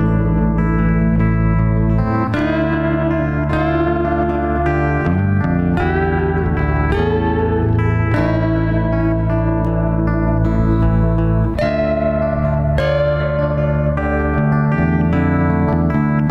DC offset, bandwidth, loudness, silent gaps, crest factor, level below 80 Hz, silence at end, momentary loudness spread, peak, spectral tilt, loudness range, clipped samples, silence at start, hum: under 0.1%; 5.8 kHz; -16 LUFS; none; 10 dB; -24 dBFS; 0 s; 2 LU; -6 dBFS; -10 dB/octave; 1 LU; under 0.1%; 0 s; none